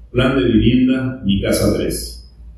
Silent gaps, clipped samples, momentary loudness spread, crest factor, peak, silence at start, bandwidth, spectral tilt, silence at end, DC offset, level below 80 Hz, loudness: none; under 0.1%; 9 LU; 16 dB; -2 dBFS; 0 s; 13.5 kHz; -6 dB/octave; 0.05 s; under 0.1%; -30 dBFS; -16 LUFS